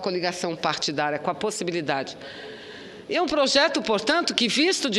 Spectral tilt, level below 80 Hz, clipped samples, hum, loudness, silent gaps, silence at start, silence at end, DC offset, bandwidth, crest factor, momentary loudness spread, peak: -3 dB/octave; -62 dBFS; under 0.1%; none; -23 LUFS; none; 0 s; 0 s; under 0.1%; 13.5 kHz; 22 dB; 18 LU; -4 dBFS